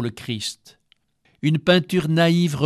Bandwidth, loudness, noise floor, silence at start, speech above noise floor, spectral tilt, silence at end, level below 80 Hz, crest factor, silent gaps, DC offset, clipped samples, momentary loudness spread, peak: 13 kHz; -20 LUFS; -63 dBFS; 0 s; 43 dB; -6 dB/octave; 0 s; -58 dBFS; 18 dB; none; under 0.1%; under 0.1%; 11 LU; -4 dBFS